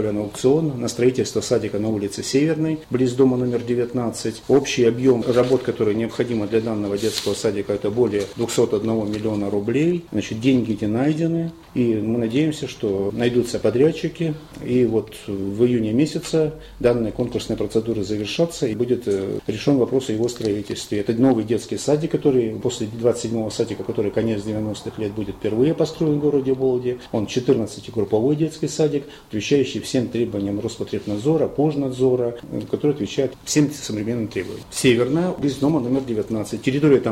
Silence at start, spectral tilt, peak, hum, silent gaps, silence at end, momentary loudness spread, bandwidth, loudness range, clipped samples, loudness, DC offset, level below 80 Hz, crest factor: 0 s; -6 dB/octave; -4 dBFS; none; none; 0 s; 8 LU; 16 kHz; 2 LU; under 0.1%; -21 LUFS; under 0.1%; -50 dBFS; 16 dB